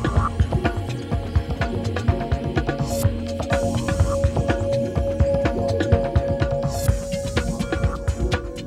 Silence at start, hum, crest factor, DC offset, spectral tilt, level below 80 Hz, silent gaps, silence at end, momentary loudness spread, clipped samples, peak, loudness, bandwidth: 0 s; none; 18 dB; under 0.1%; -6.5 dB/octave; -28 dBFS; none; 0 s; 5 LU; under 0.1%; -4 dBFS; -23 LUFS; 15.5 kHz